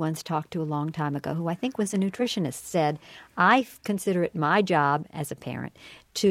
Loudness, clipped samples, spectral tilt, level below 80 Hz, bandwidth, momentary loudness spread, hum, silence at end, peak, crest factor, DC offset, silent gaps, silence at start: -26 LUFS; under 0.1%; -5.5 dB/octave; -66 dBFS; 16.5 kHz; 13 LU; none; 0 s; -8 dBFS; 20 dB; under 0.1%; none; 0 s